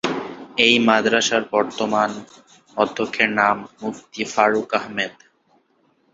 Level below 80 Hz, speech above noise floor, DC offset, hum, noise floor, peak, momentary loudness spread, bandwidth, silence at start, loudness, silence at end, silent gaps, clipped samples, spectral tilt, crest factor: -62 dBFS; 43 dB; under 0.1%; none; -62 dBFS; 0 dBFS; 14 LU; 8 kHz; 0.05 s; -19 LUFS; 1.05 s; none; under 0.1%; -3 dB/octave; 20 dB